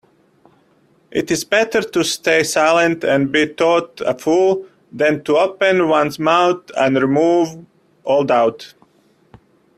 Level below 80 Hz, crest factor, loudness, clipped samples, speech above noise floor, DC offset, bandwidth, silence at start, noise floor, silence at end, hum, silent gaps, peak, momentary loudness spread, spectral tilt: -58 dBFS; 16 dB; -16 LUFS; under 0.1%; 40 dB; under 0.1%; 15 kHz; 1.1 s; -56 dBFS; 1.1 s; none; none; 0 dBFS; 8 LU; -4 dB/octave